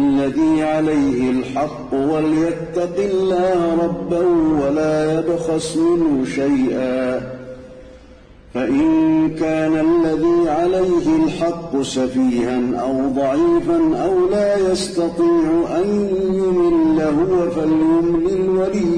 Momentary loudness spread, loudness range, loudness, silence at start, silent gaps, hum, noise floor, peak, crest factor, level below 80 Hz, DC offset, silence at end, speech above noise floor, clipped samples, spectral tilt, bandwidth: 5 LU; 3 LU; -17 LUFS; 0 s; none; none; -43 dBFS; -8 dBFS; 8 dB; -42 dBFS; under 0.1%; 0 s; 26 dB; under 0.1%; -6.5 dB/octave; 10.5 kHz